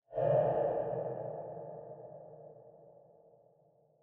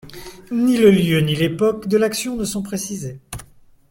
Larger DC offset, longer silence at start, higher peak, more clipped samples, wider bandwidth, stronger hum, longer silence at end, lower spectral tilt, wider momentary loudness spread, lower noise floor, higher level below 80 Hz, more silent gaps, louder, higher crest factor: neither; about the same, 0.1 s vs 0.05 s; second, -18 dBFS vs -2 dBFS; neither; second, 3.4 kHz vs 17 kHz; neither; first, 1.05 s vs 0.45 s; first, -8.5 dB/octave vs -5.5 dB/octave; about the same, 24 LU vs 22 LU; first, -68 dBFS vs -46 dBFS; second, -70 dBFS vs -46 dBFS; neither; second, -35 LUFS vs -18 LUFS; about the same, 20 dB vs 18 dB